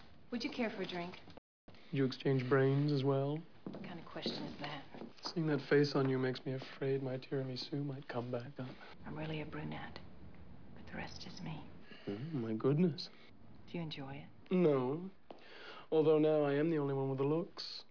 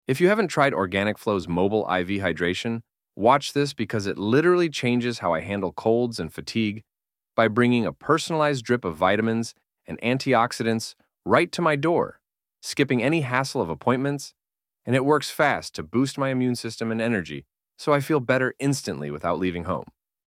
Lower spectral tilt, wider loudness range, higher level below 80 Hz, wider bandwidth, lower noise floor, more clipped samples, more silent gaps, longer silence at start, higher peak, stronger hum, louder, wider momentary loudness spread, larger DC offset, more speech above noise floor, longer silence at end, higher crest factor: about the same, -6 dB/octave vs -5.5 dB/octave; first, 11 LU vs 2 LU; second, -70 dBFS vs -58 dBFS; second, 5.4 kHz vs 16 kHz; second, -59 dBFS vs -71 dBFS; neither; first, 1.38-1.68 s vs none; about the same, 0 s vs 0.1 s; second, -20 dBFS vs -4 dBFS; neither; second, -37 LUFS vs -24 LUFS; first, 19 LU vs 10 LU; first, 0.2% vs under 0.1%; second, 23 dB vs 48 dB; second, 0.1 s vs 0.45 s; about the same, 18 dB vs 20 dB